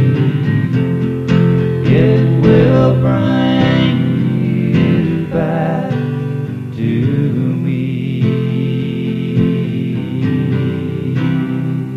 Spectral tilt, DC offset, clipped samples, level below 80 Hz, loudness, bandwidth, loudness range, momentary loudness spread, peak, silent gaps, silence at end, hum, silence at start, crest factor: -9 dB/octave; under 0.1%; under 0.1%; -40 dBFS; -14 LUFS; 6 kHz; 5 LU; 8 LU; 0 dBFS; none; 0 s; none; 0 s; 14 dB